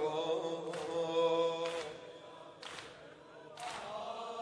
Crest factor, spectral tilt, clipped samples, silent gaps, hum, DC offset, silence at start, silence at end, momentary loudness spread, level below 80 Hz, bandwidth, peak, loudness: 16 dB; -4 dB/octave; under 0.1%; none; none; under 0.1%; 0 s; 0 s; 20 LU; -80 dBFS; 11 kHz; -22 dBFS; -38 LUFS